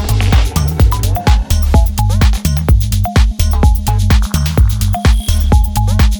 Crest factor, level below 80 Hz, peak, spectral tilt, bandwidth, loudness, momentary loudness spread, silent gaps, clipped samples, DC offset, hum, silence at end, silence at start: 10 dB; -12 dBFS; 0 dBFS; -5.5 dB/octave; over 20 kHz; -13 LUFS; 2 LU; none; under 0.1%; under 0.1%; none; 0 s; 0 s